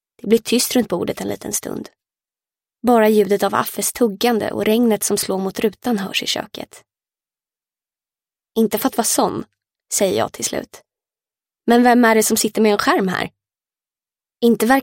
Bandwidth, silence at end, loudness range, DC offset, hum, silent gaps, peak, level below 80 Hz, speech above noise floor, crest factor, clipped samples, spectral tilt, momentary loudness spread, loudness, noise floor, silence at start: 17 kHz; 0 s; 6 LU; under 0.1%; none; none; 0 dBFS; -56 dBFS; over 73 dB; 18 dB; under 0.1%; -3.5 dB/octave; 12 LU; -18 LUFS; under -90 dBFS; 0.25 s